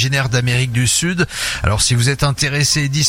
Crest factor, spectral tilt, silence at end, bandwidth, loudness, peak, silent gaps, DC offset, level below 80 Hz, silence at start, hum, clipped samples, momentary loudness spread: 16 dB; -3.5 dB/octave; 0 s; 16.5 kHz; -15 LUFS; 0 dBFS; none; under 0.1%; -34 dBFS; 0 s; none; under 0.1%; 4 LU